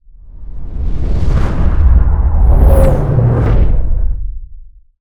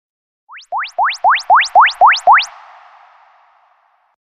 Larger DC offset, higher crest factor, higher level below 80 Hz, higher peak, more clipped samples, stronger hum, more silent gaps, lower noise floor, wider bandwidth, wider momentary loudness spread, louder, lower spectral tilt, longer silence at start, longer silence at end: neither; about the same, 10 dB vs 14 dB; first, -12 dBFS vs -58 dBFS; about the same, 0 dBFS vs 0 dBFS; neither; neither; neither; second, -33 dBFS vs -56 dBFS; first, 12.5 kHz vs 11 kHz; first, 18 LU vs 15 LU; about the same, -13 LUFS vs -11 LUFS; first, -9 dB/octave vs 1.5 dB/octave; second, 0.35 s vs 0.55 s; second, 0.35 s vs 1.75 s